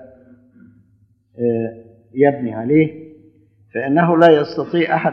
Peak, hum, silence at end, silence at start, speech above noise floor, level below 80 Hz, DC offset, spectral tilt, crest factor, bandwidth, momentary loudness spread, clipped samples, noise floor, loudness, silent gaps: 0 dBFS; none; 0 s; 0 s; 41 dB; -66 dBFS; under 0.1%; -9 dB/octave; 18 dB; 6.2 kHz; 14 LU; under 0.1%; -57 dBFS; -16 LUFS; none